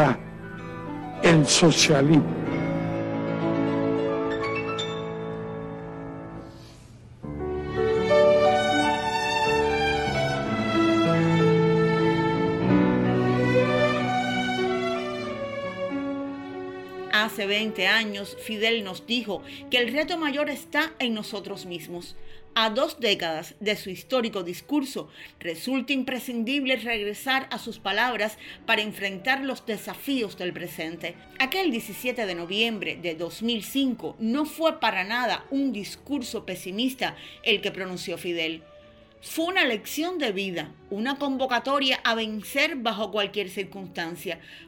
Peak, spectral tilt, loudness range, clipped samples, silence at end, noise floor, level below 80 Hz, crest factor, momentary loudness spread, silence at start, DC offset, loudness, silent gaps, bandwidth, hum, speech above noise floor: -8 dBFS; -4.5 dB/octave; 6 LU; under 0.1%; 0 s; -51 dBFS; -52 dBFS; 18 dB; 14 LU; 0 s; under 0.1%; -25 LUFS; none; 18 kHz; none; 25 dB